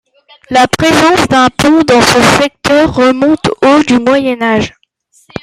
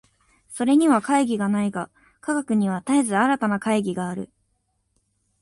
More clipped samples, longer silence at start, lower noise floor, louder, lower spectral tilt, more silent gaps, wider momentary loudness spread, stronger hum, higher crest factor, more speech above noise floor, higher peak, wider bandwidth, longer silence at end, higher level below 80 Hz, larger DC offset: neither; about the same, 0.5 s vs 0.5 s; second, -50 dBFS vs -71 dBFS; first, -8 LUFS vs -22 LUFS; second, -4 dB/octave vs -5.5 dB/octave; neither; second, 6 LU vs 16 LU; neither; second, 10 dB vs 18 dB; second, 42 dB vs 50 dB; first, 0 dBFS vs -6 dBFS; first, 15.5 kHz vs 11.5 kHz; second, 0.75 s vs 1.15 s; first, -38 dBFS vs -64 dBFS; neither